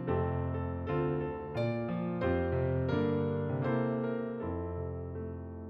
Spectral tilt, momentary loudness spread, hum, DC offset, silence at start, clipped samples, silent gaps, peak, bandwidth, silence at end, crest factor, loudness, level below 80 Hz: -10.5 dB/octave; 8 LU; none; under 0.1%; 0 s; under 0.1%; none; -20 dBFS; 5.4 kHz; 0 s; 14 dB; -34 LUFS; -50 dBFS